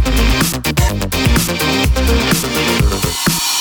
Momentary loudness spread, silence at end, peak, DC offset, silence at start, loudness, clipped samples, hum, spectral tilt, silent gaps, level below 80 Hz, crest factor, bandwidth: 2 LU; 0 s; 0 dBFS; under 0.1%; 0 s; -14 LUFS; under 0.1%; none; -4 dB/octave; none; -18 dBFS; 14 dB; over 20 kHz